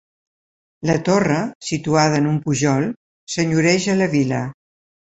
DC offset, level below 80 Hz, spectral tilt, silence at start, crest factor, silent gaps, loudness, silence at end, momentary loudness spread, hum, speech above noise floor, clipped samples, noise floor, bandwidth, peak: under 0.1%; -54 dBFS; -5.5 dB/octave; 0.8 s; 18 dB; 1.55-1.61 s, 2.96-3.27 s; -19 LUFS; 0.6 s; 10 LU; none; over 72 dB; under 0.1%; under -90 dBFS; 8.2 kHz; -2 dBFS